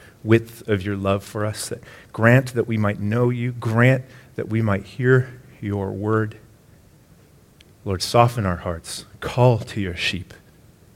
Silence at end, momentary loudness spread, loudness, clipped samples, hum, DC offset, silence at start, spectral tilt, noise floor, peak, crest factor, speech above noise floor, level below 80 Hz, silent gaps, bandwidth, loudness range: 0.7 s; 15 LU; -21 LUFS; under 0.1%; none; under 0.1%; 0.25 s; -6.5 dB/octave; -51 dBFS; 0 dBFS; 22 dB; 31 dB; -50 dBFS; none; 15.5 kHz; 4 LU